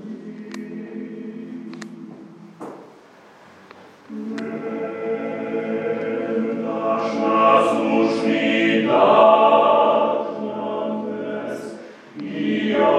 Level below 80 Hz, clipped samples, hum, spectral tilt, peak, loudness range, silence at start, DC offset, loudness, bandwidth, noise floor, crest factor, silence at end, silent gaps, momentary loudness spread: -82 dBFS; under 0.1%; none; -6 dB/octave; -2 dBFS; 20 LU; 0 s; under 0.1%; -19 LUFS; 10.5 kHz; -47 dBFS; 20 dB; 0 s; none; 21 LU